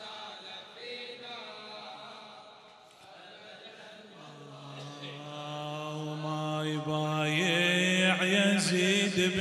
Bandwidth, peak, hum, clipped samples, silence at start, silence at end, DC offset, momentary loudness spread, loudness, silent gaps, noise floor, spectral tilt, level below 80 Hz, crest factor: 14 kHz; -12 dBFS; none; under 0.1%; 0 s; 0 s; under 0.1%; 24 LU; -29 LUFS; none; -55 dBFS; -4 dB/octave; -78 dBFS; 20 dB